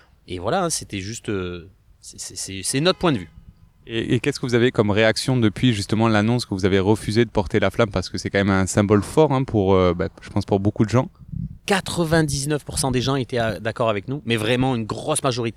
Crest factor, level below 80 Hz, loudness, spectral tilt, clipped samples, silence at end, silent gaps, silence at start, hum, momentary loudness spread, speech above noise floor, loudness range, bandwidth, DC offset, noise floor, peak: 18 dB; -44 dBFS; -21 LUFS; -5 dB/octave; under 0.1%; 0.05 s; none; 0.3 s; none; 11 LU; 27 dB; 5 LU; 15 kHz; under 0.1%; -47 dBFS; -4 dBFS